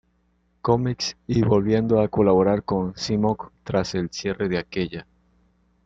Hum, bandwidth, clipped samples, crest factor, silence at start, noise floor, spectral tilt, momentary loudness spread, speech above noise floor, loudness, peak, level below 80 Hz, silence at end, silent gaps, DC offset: none; 7.8 kHz; under 0.1%; 18 dB; 0.65 s; -66 dBFS; -6.5 dB/octave; 10 LU; 44 dB; -23 LUFS; -4 dBFS; -48 dBFS; 0.85 s; none; under 0.1%